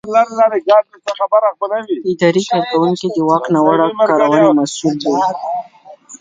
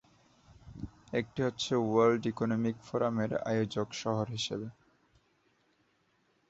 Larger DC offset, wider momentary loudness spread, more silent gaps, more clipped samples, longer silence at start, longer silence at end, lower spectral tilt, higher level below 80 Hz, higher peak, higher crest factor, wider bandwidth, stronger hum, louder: neither; second, 9 LU vs 18 LU; neither; neither; second, 0.05 s vs 0.65 s; second, 0.05 s vs 1.8 s; about the same, -5.5 dB/octave vs -5.5 dB/octave; about the same, -62 dBFS vs -64 dBFS; first, 0 dBFS vs -14 dBFS; second, 14 dB vs 20 dB; first, 9.4 kHz vs 8 kHz; neither; first, -14 LUFS vs -32 LUFS